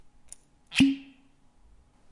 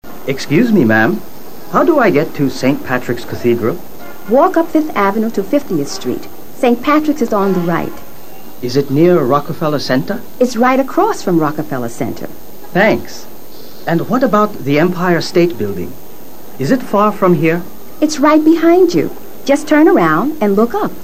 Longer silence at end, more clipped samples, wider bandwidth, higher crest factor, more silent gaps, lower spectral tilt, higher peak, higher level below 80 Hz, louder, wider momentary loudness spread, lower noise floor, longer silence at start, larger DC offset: first, 1.1 s vs 0 s; neither; second, 11.5 kHz vs 15.5 kHz; first, 22 dB vs 14 dB; neither; second, -4 dB/octave vs -6 dB/octave; second, -10 dBFS vs 0 dBFS; second, -58 dBFS vs -48 dBFS; second, -26 LUFS vs -14 LUFS; first, 26 LU vs 13 LU; first, -59 dBFS vs -35 dBFS; first, 0.7 s vs 0 s; second, under 0.1% vs 7%